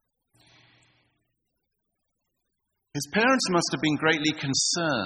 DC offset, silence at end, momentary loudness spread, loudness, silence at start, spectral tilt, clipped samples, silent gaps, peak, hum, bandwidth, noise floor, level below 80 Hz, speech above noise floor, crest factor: under 0.1%; 0 s; 7 LU; -24 LUFS; 2.95 s; -3 dB/octave; under 0.1%; none; -8 dBFS; none; 12.5 kHz; -80 dBFS; -66 dBFS; 55 dB; 20 dB